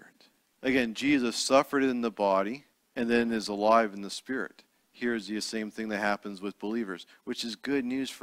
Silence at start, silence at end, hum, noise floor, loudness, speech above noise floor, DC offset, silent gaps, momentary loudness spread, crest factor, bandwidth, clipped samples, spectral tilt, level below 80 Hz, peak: 0.6 s; 0.05 s; none; -65 dBFS; -29 LUFS; 36 dB; under 0.1%; none; 13 LU; 22 dB; 16 kHz; under 0.1%; -4 dB/octave; -64 dBFS; -8 dBFS